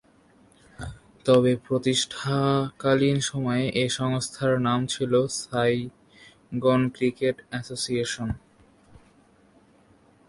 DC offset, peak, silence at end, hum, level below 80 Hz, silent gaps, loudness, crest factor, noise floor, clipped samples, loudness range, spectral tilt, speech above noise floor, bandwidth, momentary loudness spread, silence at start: under 0.1%; -8 dBFS; 1.9 s; none; -54 dBFS; none; -25 LUFS; 18 dB; -58 dBFS; under 0.1%; 4 LU; -5 dB/octave; 34 dB; 11.5 kHz; 12 LU; 0.8 s